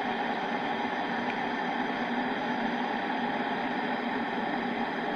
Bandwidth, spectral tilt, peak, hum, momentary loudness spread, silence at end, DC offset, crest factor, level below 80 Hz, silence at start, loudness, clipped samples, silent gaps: 8 kHz; -5.5 dB/octave; -18 dBFS; none; 1 LU; 0 s; under 0.1%; 12 dB; -66 dBFS; 0 s; -31 LUFS; under 0.1%; none